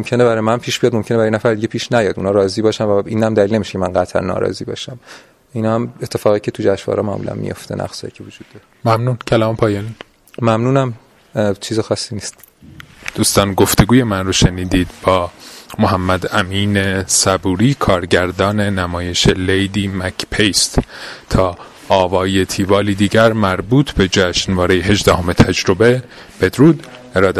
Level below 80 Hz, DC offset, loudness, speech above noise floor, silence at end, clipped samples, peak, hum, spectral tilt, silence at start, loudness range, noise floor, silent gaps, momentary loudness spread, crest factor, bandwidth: -34 dBFS; under 0.1%; -15 LUFS; 24 dB; 0 s; under 0.1%; 0 dBFS; none; -5 dB/octave; 0 s; 6 LU; -39 dBFS; none; 12 LU; 16 dB; 15.5 kHz